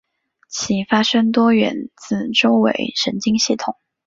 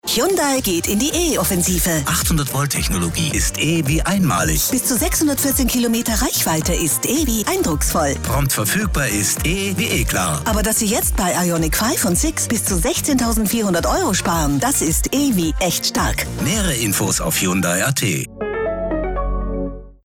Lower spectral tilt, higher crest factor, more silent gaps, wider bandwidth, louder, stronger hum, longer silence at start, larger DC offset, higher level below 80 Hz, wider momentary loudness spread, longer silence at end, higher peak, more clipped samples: about the same, -4 dB/octave vs -3.5 dB/octave; first, 16 dB vs 10 dB; neither; second, 7.6 kHz vs 18 kHz; about the same, -17 LUFS vs -17 LUFS; neither; first, 0.5 s vs 0.05 s; neither; second, -56 dBFS vs -28 dBFS; first, 11 LU vs 3 LU; first, 0.35 s vs 0.1 s; first, -2 dBFS vs -8 dBFS; neither